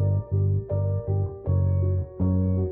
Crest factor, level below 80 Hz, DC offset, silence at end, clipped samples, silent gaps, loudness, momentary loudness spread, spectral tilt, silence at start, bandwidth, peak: 10 dB; -42 dBFS; under 0.1%; 0 s; under 0.1%; none; -25 LUFS; 3 LU; -15.5 dB/octave; 0 s; 1.8 kHz; -14 dBFS